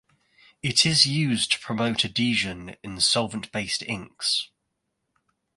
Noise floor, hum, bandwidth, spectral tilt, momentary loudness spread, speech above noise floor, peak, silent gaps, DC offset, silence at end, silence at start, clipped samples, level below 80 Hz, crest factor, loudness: -78 dBFS; none; 11.5 kHz; -3 dB/octave; 13 LU; 53 dB; -2 dBFS; none; under 0.1%; 1.1 s; 0.65 s; under 0.1%; -56 dBFS; 26 dB; -23 LUFS